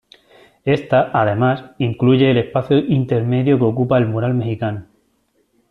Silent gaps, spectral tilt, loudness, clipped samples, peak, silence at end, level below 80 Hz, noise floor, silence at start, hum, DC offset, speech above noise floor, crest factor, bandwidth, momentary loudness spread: none; -9.5 dB/octave; -17 LUFS; under 0.1%; -2 dBFS; 0.9 s; -52 dBFS; -63 dBFS; 0.65 s; none; under 0.1%; 47 dB; 14 dB; 4.5 kHz; 8 LU